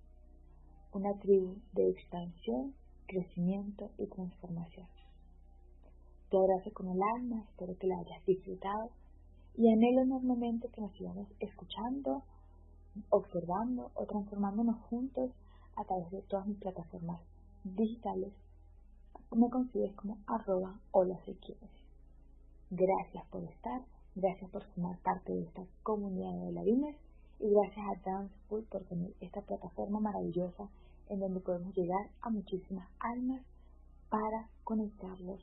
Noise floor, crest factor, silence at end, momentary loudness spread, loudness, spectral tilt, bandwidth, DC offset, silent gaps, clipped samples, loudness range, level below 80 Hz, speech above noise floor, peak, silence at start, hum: -58 dBFS; 22 dB; 0 s; 14 LU; -37 LUFS; -6 dB/octave; 3.7 kHz; under 0.1%; none; under 0.1%; 7 LU; -58 dBFS; 22 dB; -14 dBFS; 0.15 s; none